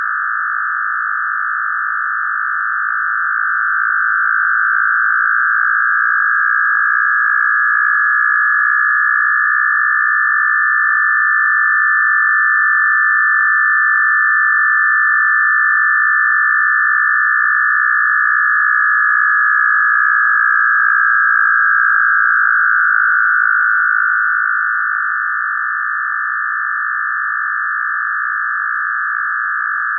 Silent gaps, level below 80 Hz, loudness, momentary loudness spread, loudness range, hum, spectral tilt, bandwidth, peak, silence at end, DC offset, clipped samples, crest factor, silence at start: none; under -90 dBFS; -12 LUFS; 6 LU; 6 LU; none; 3.5 dB/octave; 1.9 kHz; 0 dBFS; 0 s; under 0.1%; under 0.1%; 14 dB; 0 s